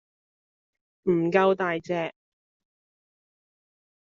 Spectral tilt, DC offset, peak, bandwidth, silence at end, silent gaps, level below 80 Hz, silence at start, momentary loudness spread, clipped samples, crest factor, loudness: -5 dB/octave; under 0.1%; -8 dBFS; 7.2 kHz; 2 s; none; -72 dBFS; 1.05 s; 10 LU; under 0.1%; 22 dB; -25 LUFS